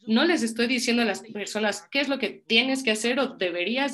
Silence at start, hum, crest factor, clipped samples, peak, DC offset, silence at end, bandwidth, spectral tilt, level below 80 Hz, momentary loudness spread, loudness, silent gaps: 0.05 s; none; 20 dB; under 0.1%; -4 dBFS; under 0.1%; 0 s; 12.5 kHz; -3 dB/octave; -72 dBFS; 6 LU; -24 LUFS; none